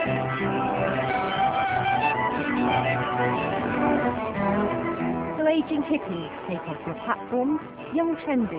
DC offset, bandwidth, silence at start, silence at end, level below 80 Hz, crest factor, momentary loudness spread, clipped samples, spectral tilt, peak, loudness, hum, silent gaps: under 0.1%; 4 kHz; 0 s; 0 s; -50 dBFS; 14 dB; 7 LU; under 0.1%; -10 dB/octave; -10 dBFS; -25 LUFS; none; none